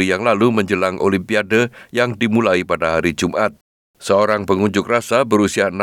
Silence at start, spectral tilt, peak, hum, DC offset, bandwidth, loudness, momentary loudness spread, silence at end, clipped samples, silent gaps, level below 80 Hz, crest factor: 0 s; -5.5 dB/octave; -2 dBFS; none; under 0.1%; 16.5 kHz; -17 LUFS; 4 LU; 0 s; under 0.1%; 3.61-3.94 s; -54 dBFS; 14 dB